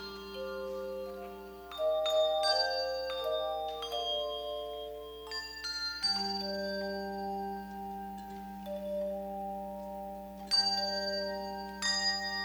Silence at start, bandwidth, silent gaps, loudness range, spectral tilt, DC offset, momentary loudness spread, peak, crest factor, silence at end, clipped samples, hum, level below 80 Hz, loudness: 0 s; over 20 kHz; none; 6 LU; -2.5 dB/octave; under 0.1%; 14 LU; -16 dBFS; 18 dB; 0 s; under 0.1%; none; -60 dBFS; -34 LUFS